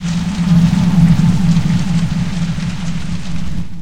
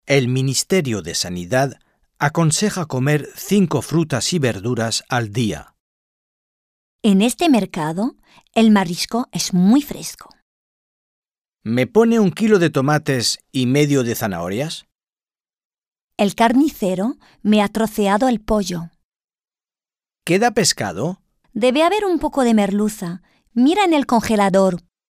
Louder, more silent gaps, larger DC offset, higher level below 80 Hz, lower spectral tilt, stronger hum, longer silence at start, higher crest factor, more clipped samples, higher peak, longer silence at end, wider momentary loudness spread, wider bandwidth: first, -15 LUFS vs -18 LUFS; second, none vs 5.80-6.99 s, 10.42-11.22 s, 14.95-14.99 s, 15.65-15.70 s, 15.87-15.91 s, 16.01-16.08 s, 19.05-19.10 s, 19.24-19.28 s; first, 7% vs under 0.1%; first, -28 dBFS vs -48 dBFS; first, -7 dB/octave vs -5 dB/octave; neither; about the same, 0 s vs 0.05 s; second, 12 dB vs 18 dB; neither; about the same, 0 dBFS vs -2 dBFS; second, 0 s vs 0.3 s; about the same, 12 LU vs 11 LU; second, 10 kHz vs 15.5 kHz